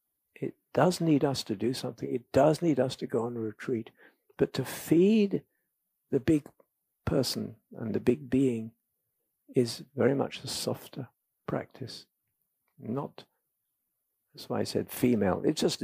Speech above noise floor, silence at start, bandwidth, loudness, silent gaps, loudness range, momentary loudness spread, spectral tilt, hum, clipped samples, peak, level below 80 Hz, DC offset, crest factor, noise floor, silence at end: 53 dB; 0.4 s; 15.5 kHz; -30 LUFS; none; 10 LU; 17 LU; -6 dB/octave; none; under 0.1%; -10 dBFS; -62 dBFS; under 0.1%; 20 dB; -82 dBFS; 0 s